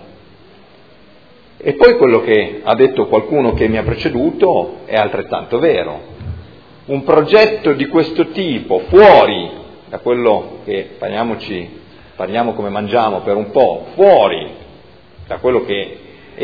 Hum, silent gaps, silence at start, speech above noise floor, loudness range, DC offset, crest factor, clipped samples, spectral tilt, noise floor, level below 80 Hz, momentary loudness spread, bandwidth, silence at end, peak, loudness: none; none; 1.65 s; 32 dB; 7 LU; 0.4%; 14 dB; 0.4%; -8 dB/octave; -45 dBFS; -40 dBFS; 17 LU; 5.4 kHz; 0 s; 0 dBFS; -13 LUFS